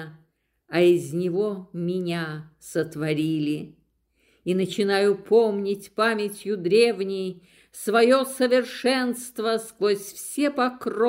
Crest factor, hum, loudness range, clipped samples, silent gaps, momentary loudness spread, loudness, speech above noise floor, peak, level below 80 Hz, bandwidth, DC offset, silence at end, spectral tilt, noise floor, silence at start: 18 dB; none; 5 LU; under 0.1%; none; 11 LU; -24 LUFS; 44 dB; -6 dBFS; -70 dBFS; 16 kHz; under 0.1%; 0 s; -5 dB/octave; -67 dBFS; 0 s